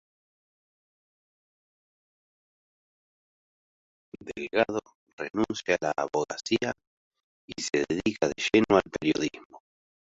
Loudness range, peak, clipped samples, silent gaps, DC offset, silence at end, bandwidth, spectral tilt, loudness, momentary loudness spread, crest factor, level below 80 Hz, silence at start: 8 LU; -6 dBFS; under 0.1%; 4.95-5.07 s, 5.13-5.18 s, 6.87-7.11 s, 7.24-7.48 s, 9.45-9.50 s; under 0.1%; 0.55 s; 8 kHz; -4 dB/octave; -28 LUFS; 14 LU; 24 dB; -60 dBFS; 4.15 s